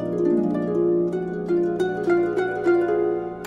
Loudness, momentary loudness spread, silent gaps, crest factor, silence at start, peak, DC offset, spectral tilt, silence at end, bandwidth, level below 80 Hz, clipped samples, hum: -22 LUFS; 4 LU; none; 12 dB; 0 s; -10 dBFS; under 0.1%; -8 dB/octave; 0 s; 7.2 kHz; -56 dBFS; under 0.1%; none